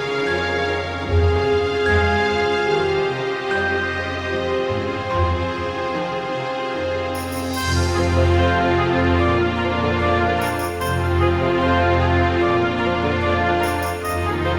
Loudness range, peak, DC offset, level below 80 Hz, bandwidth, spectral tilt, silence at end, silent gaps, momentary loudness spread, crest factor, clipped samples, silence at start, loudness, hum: 4 LU; -6 dBFS; under 0.1%; -38 dBFS; over 20 kHz; -6 dB/octave; 0 s; none; 6 LU; 14 dB; under 0.1%; 0 s; -20 LUFS; none